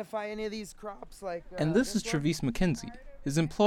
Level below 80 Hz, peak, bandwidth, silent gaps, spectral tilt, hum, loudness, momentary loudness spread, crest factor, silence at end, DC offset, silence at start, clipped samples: -46 dBFS; -12 dBFS; 16 kHz; none; -5.5 dB/octave; none; -32 LUFS; 14 LU; 18 dB; 0 s; under 0.1%; 0 s; under 0.1%